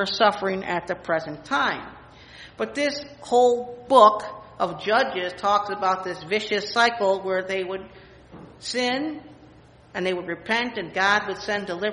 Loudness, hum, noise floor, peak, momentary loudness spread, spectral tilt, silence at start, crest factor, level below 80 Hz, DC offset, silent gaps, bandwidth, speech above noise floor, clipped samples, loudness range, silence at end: -23 LUFS; none; -50 dBFS; 0 dBFS; 13 LU; -3.5 dB/octave; 0 s; 24 dB; -60 dBFS; under 0.1%; none; 10.5 kHz; 27 dB; under 0.1%; 7 LU; 0 s